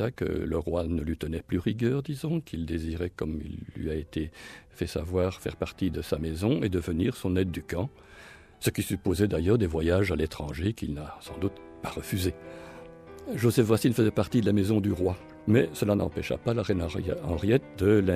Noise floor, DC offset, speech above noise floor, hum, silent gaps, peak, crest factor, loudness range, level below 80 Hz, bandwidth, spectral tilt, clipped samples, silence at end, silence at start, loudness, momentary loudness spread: -50 dBFS; under 0.1%; 23 dB; none; none; -10 dBFS; 18 dB; 7 LU; -44 dBFS; 15.5 kHz; -7 dB/octave; under 0.1%; 0 s; 0 s; -29 LUFS; 13 LU